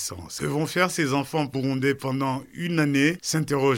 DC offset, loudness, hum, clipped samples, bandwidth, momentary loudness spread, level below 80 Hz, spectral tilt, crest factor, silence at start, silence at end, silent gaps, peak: under 0.1%; -25 LUFS; none; under 0.1%; 17 kHz; 7 LU; -58 dBFS; -5 dB/octave; 18 dB; 0 s; 0 s; none; -6 dBFS